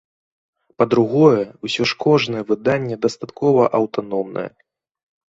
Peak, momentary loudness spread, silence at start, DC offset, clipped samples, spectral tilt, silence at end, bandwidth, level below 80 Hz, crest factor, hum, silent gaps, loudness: -2 dBFS; 10 LU; 0.8 s; under 0.1%; under 0.1%; -6.5 dB/octave; 0.9 s; 8 kHz; -60 dBFS; 18 dB; none; none; -18 LUFS